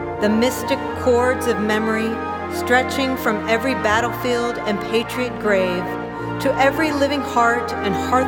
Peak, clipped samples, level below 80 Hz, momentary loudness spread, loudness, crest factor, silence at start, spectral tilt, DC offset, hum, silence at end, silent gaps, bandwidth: -4 dBFS; under 0.1%; -46 dBFS; 6 LU; -19 LUFS; 16 dB; 0 s; -5 dB/octave; under 0.1%; none; 0 s; none; 18.5 kHz